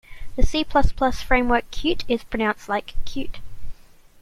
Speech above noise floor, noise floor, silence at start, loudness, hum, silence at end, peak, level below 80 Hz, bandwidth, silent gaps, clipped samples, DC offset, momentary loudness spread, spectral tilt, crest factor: 24 dB; -44 dBFS; 0.1 s; -23 LUFS; none; 0.5 s; -2 dBFS; -28 dBFS; 11.5 kHz; none; under 0.1%; under 0.1%; 13 LU; -5 dB/octave; 18 dB